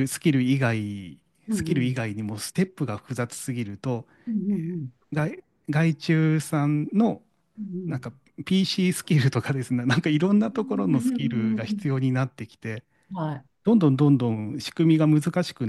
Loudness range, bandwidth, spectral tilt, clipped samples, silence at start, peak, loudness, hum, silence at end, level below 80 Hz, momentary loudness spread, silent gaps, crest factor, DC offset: 5 LU; 12.5 kHz; -6.5 dB/octave; under 0.1%; 0 s; -8 dBFS; -25 LUFS; none; 0 s; -62 dBFS; 14 LU; none; 16 dB; under 0.1%